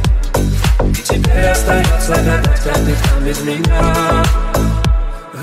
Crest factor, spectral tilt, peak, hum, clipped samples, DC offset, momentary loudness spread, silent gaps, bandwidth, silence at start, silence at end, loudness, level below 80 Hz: 10 dB; -5 dB/octave; -2 dBFS; none; under 0.1%; under 0.1%; 4 LU; none; 16 kHz; 0 s; 0 s; -14 LUFS; -14 dBFS